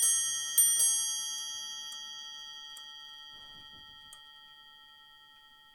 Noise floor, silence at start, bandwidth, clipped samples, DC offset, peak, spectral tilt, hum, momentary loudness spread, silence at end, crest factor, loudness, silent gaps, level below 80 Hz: -58 dBFS; 0 s; over 20 kHz; under 0.1%; under 0.1%; -12 dBFS; 4 dB/octave; none; 26 LU; 0.6 s; 22 dB; -28 LUFS; none; -74 dBFS